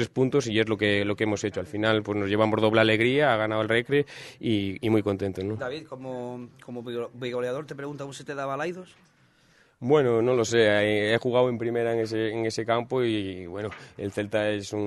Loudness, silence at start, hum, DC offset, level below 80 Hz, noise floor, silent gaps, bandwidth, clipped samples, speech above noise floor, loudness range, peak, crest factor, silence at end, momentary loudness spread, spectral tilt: -26 LUFS; 0 s; none; under 0.1%; -64 dBFS; -61 dBFS; none; 12.5 kHz; under 0.1%; 35 dB; 10 LU; -4 dBFS; 22 dB; 0 s; 14 LU; -5.5 dB/octave